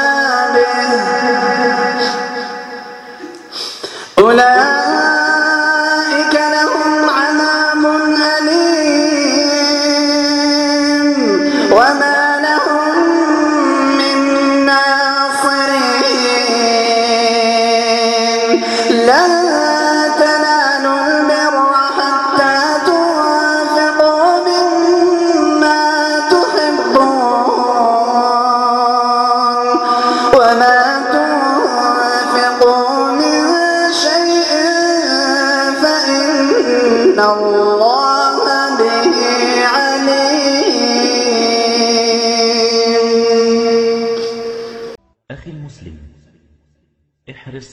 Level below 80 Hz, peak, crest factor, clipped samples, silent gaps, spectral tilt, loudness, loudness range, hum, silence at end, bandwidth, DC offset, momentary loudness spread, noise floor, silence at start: -54 dBFS; 0 dBFS; 12 dB; under 0.1%; none; -2.5 dB/octave; -12 LUFS; 2 LU; none; 0.05 s; 12.5 kHz; under 0.1%; 3 LU; -62 dBFS; 0 s